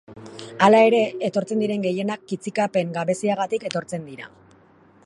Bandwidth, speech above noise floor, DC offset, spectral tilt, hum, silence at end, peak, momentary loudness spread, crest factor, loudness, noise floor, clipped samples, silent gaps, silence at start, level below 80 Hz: 11.5 kHz; 33 dB; under 0.1%; -5.5 dB/octave; none; 0.8 s; -2 dBFS; 23 LU; 20 dB; -21 LUFS; -54 dBFS; under 0.1%; none; 0.1 s; -68 dBFS